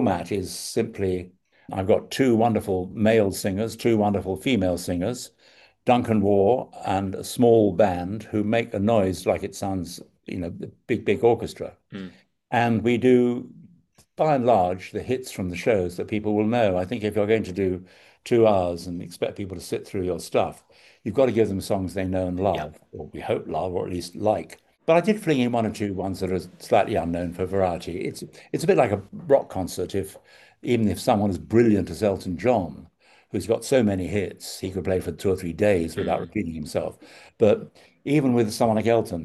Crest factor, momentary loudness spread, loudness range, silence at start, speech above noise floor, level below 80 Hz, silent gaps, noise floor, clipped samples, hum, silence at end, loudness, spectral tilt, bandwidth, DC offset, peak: 18 dB; 13 LU; 4 LU; 0 s; 35 dB; -54 dBFS; none; -58 dBFS; under 0.1%; none; 0 s; -24 LUFS; -6.5 dB/octave; 12.5 kHz; under 0.1%; -6 dBFS